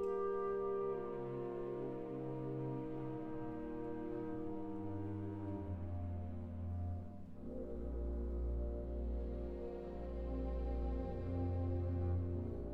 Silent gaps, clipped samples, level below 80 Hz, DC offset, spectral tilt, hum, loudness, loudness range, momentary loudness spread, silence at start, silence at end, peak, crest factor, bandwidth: none; under 0.1%; -48 dBFS; under 0.1%; -11 dB/octave; none; -43 LUFS; 3 LU; 7 LU; 0 s; 0 s; -28 dBFS; 12 dB; 4.6 kHz